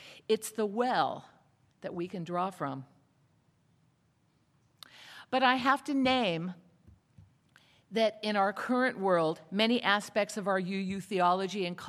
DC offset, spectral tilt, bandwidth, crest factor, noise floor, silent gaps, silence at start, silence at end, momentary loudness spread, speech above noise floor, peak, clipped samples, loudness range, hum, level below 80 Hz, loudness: under 0.1%; -4.5 dB/octave; 15 kHz; 22 dB; -71 dBFS; none; 0 s; 0 s; 12 LU; 40 dB; -10 dBFS; under 0.1%; 11 LU; none; -74 dBFS; -30 LUFS